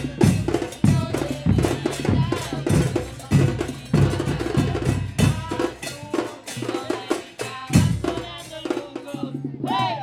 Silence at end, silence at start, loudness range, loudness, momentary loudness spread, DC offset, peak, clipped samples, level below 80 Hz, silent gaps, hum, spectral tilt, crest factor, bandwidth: 0 s; 0 s; 4 LU; -23 LUFS; 11 LU; under 0.1%; -4 dBFS; under 0.1%; -38 dBFS; none; none; -6 dB/octave; 20 dB; 15.5 kHz